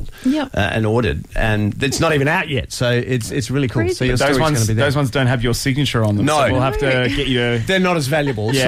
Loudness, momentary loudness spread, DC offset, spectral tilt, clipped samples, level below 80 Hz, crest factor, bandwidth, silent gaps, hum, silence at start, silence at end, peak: -17 LUFS; 4 LU; under 0.1%; -5 dB/octave; under 0.1%; -32 dBFS; 12 dB; 16 kHz; none; none; 0 s; 0 s; -4 dBFS